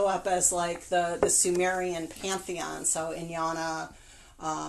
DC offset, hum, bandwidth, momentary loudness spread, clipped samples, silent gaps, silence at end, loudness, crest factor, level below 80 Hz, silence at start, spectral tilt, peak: under 0.1%; none; 12.5 kHz; 12 LU; under 0.1%; none; 0 s; -28 LUFS; 20 dB; -56 dBFS; 0 s; -2.5 dB/octave; -10 dBFS